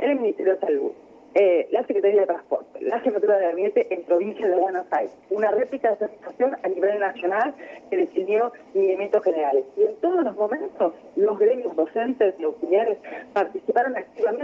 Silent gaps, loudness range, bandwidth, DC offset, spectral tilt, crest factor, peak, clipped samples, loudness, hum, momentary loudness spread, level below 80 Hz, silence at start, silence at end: none; 2 LU; 5.8 kHz; under 0.1%; -7 dB/octave; 14 dB; -8 dBFS; under 0.1%; -23 LUFS; none; 7 LU; -74 dBFS; 0 s; 0 s